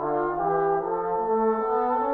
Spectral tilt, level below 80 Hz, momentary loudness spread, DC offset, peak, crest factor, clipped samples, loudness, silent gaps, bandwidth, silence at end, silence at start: -10 dB/octave; -54 dBFS; 3 LU; under 0.1%; -12 dBFS; 12 dB; under 0.1%; -25 LUFS; none; 4 kHz; 0 s; 0 s